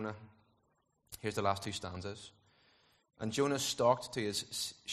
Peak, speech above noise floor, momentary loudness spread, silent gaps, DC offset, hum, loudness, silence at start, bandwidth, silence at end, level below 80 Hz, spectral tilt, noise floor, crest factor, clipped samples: -16 dBFS; 41 dB; 18 LU; none; under 0.1%; none; -36 LUFS; 0 s; 13 kHz; 0 s; -70 dBFS; -3.5 dB/octave; -77 dBFS; 22 dB; under 0.1%